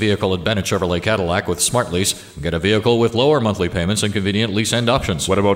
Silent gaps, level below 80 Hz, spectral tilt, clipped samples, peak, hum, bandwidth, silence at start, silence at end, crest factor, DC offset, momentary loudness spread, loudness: none; -40 dBFS; -4.5 dB/octave; under 0.1%; -2 dBFS; none; 16 kHz; 0 s; 0 s; 16 dB; under 0.1%; 4 LU; -18 LUFS